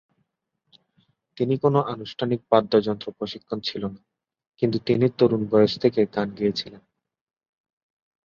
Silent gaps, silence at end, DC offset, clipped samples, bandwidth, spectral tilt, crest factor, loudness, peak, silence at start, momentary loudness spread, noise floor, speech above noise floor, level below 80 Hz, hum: 4.47-4.52 s; 1.5 s; under 0.1%; under 0.1%; 7.2 kHz; -8 dB/octave; 22 dB; -23 LUFS; -4 dBFS; 1.35 s; 12 LU; -77 dBFS; 55 dB; -62 dBFS; none